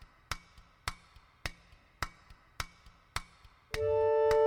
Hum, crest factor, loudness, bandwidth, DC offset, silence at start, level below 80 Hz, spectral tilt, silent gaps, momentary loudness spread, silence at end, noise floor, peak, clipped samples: none; 20 dB; -36 LUFS; 17 kHz; under 0.1%; 0.3 s; -52 dBFS; -3.5 dB/octave; none; 15 LU; 0 s; -61 dBFS; -16 dBFS; under 0.1%